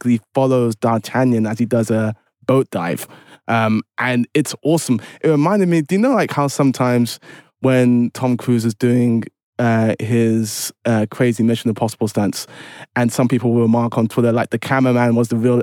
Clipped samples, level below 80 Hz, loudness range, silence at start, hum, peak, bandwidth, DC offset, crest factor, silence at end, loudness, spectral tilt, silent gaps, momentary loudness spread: under 0.1%; -70 dBFS; 2 LU; 0.05 s; none; -4 dBFS; 17 kHz; under 0.1%; 12 dB; 0 s; -17 LUFS; -6.5 dB/octave; 9.43-9.53 s; 7 LU